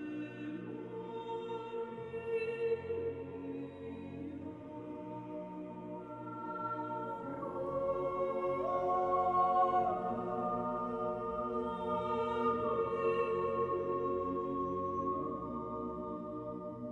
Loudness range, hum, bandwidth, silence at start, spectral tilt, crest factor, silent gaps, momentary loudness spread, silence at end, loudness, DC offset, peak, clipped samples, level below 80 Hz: 9 LU; none; 7.6 kHz; 0 s; -8.5 dB/octave; 16 dB; none; 12 LU; 0 s; -37 LUFS; under 0.1%; -20 dBFS; under 0.1%; -64 dBFS